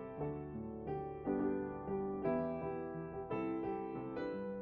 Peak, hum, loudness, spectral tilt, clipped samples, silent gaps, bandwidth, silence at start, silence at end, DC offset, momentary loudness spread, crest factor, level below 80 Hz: -24 dBFS; none; -41 LUFS; -8 dB/octave; under 0.1%; none; 4.8 kHz; 0 s; 0 s; under 0.1%; 7 LU; 16 dB; -62 dBFS